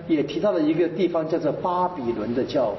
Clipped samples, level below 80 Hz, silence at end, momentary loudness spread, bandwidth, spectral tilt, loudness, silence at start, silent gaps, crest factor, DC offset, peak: under 0.1%; -56 dBFS; 0 s; 4 LU; 6 kHz; -5.5 dB/octave; -24 LUFS; 0 s; none; 12 dB; under 0.1%; -12 dBFS